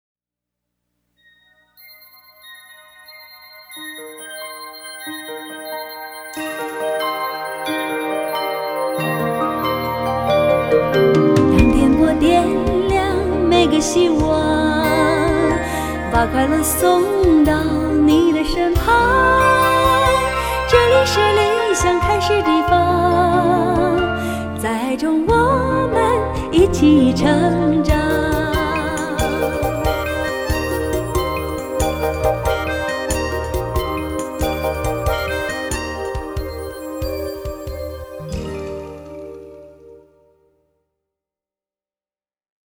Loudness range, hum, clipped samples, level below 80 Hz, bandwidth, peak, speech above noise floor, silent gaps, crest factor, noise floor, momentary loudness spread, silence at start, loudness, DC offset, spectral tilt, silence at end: 16 LU; 60 Hz at -45 dBFS; under 0.1%; -30 dBFS; over 20 kHz; 0 dBFS; over 75 dB; none; 18 dB; under -90 dBFS; 15 LU; 2.45 s; -17 LUFS; under 0.1%; -5.5 dB/octave; 2.75 s